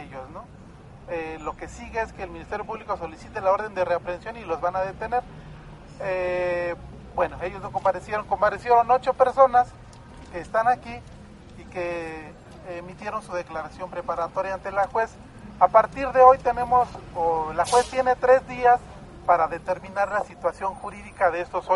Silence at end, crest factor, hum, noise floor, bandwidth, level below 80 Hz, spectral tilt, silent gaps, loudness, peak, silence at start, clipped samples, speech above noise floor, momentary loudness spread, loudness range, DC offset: 0 s; 24 dB; none; -45 dBFS; 11.5 kHz; -48 dBFS; -5 dB/octave; none; -24 LUFS; -2 dBFS; 0 s; under 0.1%; 22 dB; 19 LU; 10 LU; under 0.1%